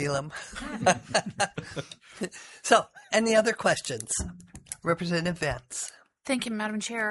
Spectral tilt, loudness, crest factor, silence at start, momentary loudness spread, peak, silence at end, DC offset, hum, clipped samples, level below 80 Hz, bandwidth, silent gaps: -3.5 dB/octave; -28 LUFS; 22 dB; 0 s; 15 LU; -6 dBFS; 0 s; under 0.1%; none; under 0.1%; -54 dBFS; 11.5 kHz; none